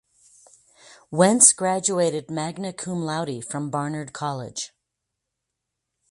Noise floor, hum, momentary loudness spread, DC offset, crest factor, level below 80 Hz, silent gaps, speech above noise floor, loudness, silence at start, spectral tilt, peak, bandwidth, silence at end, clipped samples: -82 dBFS; none; 17 LU; under 0.1%; 24 dB; -68 dBFS; none; 59 dB; -22 LUFS; 0.9 s; -3.5 dB/octave; 0 dBFS; 11.5 kHz; 1.45 s; under 0.1%